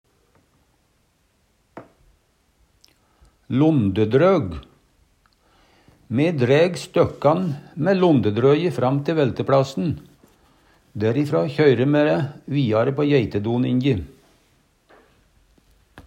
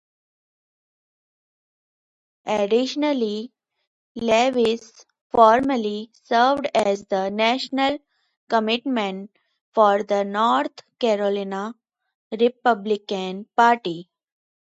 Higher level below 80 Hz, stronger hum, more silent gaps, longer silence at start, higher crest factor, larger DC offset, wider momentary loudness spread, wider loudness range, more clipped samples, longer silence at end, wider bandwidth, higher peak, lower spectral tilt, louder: first, -54 dBFS vs -64 dBFS; neither; second, none vs 3.87-4.15 s, 5.21-5.30 s, 8.37-8.47 s, 9.61-9.72 s, 12.15-12.31 s; second, 1.75 s vs 2.45 s; about the same, 18 dB vs 22 dB; neither; second, 9 LU vs 13 LU; about the same, 4 LU vs 6 LU; neither; second, 0.05 s vs 0.7 s; about the same, 10 kHz vs 10.5 kHz; second, -4 dBFS vs 0 dBFS; first, -8 dB/octave vs -4.5 dB/octave; about the same, -20 LUFS vs -21 LUFS